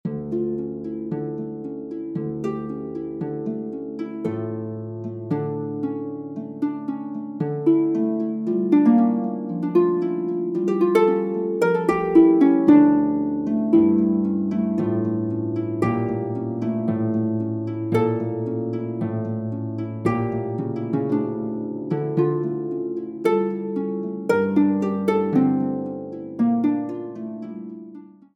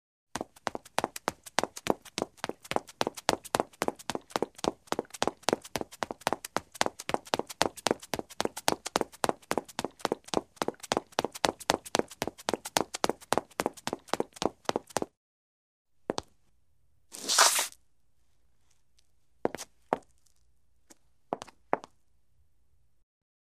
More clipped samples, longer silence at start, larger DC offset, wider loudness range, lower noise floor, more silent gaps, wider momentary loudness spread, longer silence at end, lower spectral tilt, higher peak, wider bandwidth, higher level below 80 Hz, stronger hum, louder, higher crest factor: neither; second, 0.05 s vs 0.35 s; neither; about the same, 11 LU vs 11 LU; second, -43 dBFS vs -75 dBFS; second, none vs 15.17-15.85 s; first, 13 LU vs 9 LU; second, 0.3 s vs 1.8 s; first, -9.5 dB/octave vs -2 dB/octave; second, -4 dBFS vs 0 dBFS; second, 9.8 kHz vs 15.5 kHz; first, -58 dBFS vs -64 dBFS; neither; first, -23 LUFS vs -32 LUFS; second, 18 dB vs 34 dB